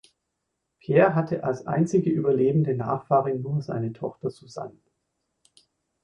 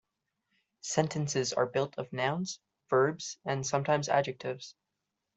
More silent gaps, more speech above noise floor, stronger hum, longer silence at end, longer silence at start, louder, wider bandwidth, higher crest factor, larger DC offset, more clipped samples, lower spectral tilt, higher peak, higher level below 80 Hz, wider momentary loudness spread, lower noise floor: neither; about the same, 56 dB vs 55 dB; neither; first, 1.35 s vs 0.65 s; about the same, 0.9 s vs 0.85 s; first, -24 LUFS vs -31 LUFS; first, 10 kHz vs 8.2 kHz; about the same, 20 dB vs 22 dB; neither; neither; first, -8.5 dB/octave vs -4.5 dB/octave; first, -6 dBFS vs -10 dBFS; first, -64 dBFS vs -72 dBFS; first, 17 LU vs 11 LU; second, -80 dBFS vs -86 dBFS